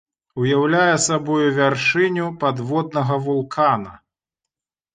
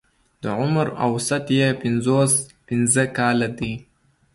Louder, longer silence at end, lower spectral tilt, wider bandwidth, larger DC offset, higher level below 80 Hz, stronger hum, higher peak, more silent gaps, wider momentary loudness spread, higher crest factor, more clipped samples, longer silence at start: about the same, -19 LUFS vs -21 LUFS; first, 1 s vs 0.5 s; about the same, -4.5 dB/octave vs -4.5 dB/octave; second, 9.6 kHz vs 12 kHz; neither; second, -60 dBFS vs -52 dBFS; neither; about the same, -4 dBFS vs -6 dBFS; neither; second, 7 LU vs 10 LU; about the same, 16 dB vs 16 dB; neither; about the same, 0.35 s vs 0.45 s